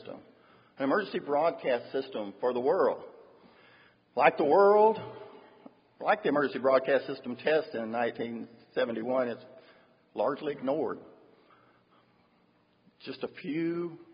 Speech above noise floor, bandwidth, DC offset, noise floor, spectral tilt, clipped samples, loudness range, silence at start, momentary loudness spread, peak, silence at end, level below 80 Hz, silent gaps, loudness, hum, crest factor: 39 dB; 5.4 kHz; under 0.1%; -67 dBFS; -9 dB/octave; under 0.1%; 10 LU; 0 s; 19 LU; -8 dBFS; 0.1 s; -80 dBFS; none; -29 LUFS; none; 22 dB